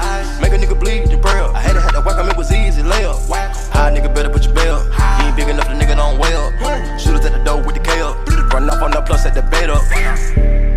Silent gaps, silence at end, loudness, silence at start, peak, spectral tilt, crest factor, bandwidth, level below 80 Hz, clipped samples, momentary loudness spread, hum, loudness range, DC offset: none; 0 s; -16 LUFS; 0 s; 0 dBFS; -5 dB/octave; 10 dB; 12 kHz; -12 dBFS; under 0.1%; 3 LU; none; 1 LU; under 0.1%